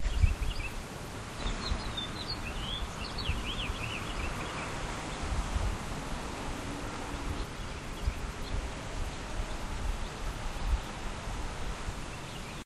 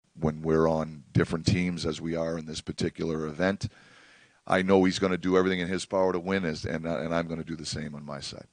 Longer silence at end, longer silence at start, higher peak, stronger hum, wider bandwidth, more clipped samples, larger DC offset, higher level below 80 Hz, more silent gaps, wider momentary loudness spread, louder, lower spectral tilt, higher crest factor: second, 0 s vs 0.15 s; second, 0 s vs 0.15 s; second, -12 dBFS vs -8 dBFS; neither; first, 13.5 kHz vs 10 kHz; neither; neither; first, -36 dBFS vs -52 dBFS; neither; second, 5 LU vs 11 LU; second, -37 LUFS vs -28 LUFS; second, -4.5 dB/octave vs -6 dB/octave; about the same, 22 dB vs 22 dB